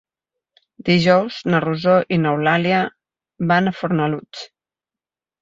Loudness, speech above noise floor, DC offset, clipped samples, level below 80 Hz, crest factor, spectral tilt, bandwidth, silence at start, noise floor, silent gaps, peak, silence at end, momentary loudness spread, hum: -18 LUFS; 72 dB; under 0.1%; under 0.1%; -58 dBFS; 18 dB; -7 dB/octave; 7.6 kHz; 0.85 s; -90 dBFS; none; -2 dBFS; 0.95 s; 12 LU; none